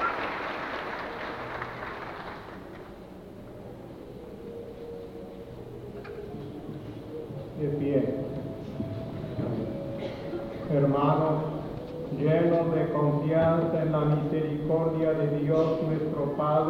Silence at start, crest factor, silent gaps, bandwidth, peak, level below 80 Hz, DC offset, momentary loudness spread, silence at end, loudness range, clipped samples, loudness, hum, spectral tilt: 0 s; 18 dB; none; 6.4 kHz; -12 dBFS; -54 dBFS; under 0.1%; 18 LU; 0 s; 16 LU; under 0.1%; -29 LUFS; none; -9 dB/octave